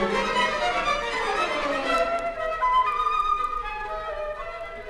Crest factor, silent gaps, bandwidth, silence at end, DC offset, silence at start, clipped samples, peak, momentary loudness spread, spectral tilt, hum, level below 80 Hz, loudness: 14 dB; none; 13.5 kHz; 0 s; under 0.1%; 0 s; under 0.1%; -12 dBFS; 9 LU; -3 dB/octave; none; -44 dBFS; -25 LUFS